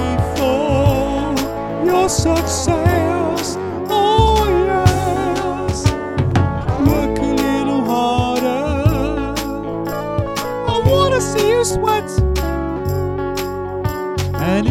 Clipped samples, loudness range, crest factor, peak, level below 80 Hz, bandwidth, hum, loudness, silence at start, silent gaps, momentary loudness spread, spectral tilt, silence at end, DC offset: under 0.1%; 3 LU; 16 dB; 0 dBFS; -28 dBFS; 17 kHz; none; -17 LUFS; 0 s; none; 7 LU; -5.5 dB/octave; 0 s; under 0.1%